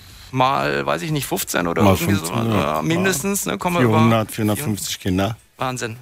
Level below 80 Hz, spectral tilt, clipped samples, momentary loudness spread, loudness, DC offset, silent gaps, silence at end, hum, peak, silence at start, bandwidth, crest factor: -48 dBFS; -5 dB/octave; under 0.1%; 8 LU; -20 LUFS; under 0.1%; none; 0 s; none; -2 dBFS; 0 s; 16 kHz; 16 dB